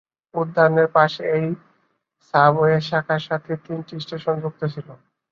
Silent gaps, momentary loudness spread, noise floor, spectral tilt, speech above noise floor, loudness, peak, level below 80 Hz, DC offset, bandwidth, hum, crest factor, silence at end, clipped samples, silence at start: none; 15 LU; -67 dBFS; -7.5 dB/octave; 47 dB; -21 LUFS; -2 dBFS; -64 dBFS; under 0.1%; 7 kHz; none; 20 dB; 0.35 s; under 0.1%; 0.35 s